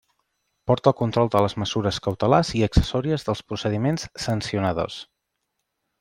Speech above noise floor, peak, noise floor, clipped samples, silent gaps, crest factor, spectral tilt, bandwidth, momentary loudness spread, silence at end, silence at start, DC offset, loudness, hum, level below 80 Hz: 56 dB; -2 dBFS; -78 dBFS; under 0.1%; none; 22 dB; -6 dB/octave; 16 kHz; 8 LU; 1 s; 0.65 s; under 0.1%; -23 LUFS; none; -38 dBFS